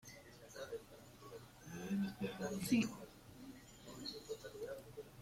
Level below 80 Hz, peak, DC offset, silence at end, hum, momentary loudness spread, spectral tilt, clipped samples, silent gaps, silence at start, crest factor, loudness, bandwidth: -70 dBFS; -24 dBFS; under 0.1%; 0 s; none; 20 LU; -5 dB/octave; under 0.1%; none; 0.05 s; 22 dB; -44 LUFS; 16.5 kHz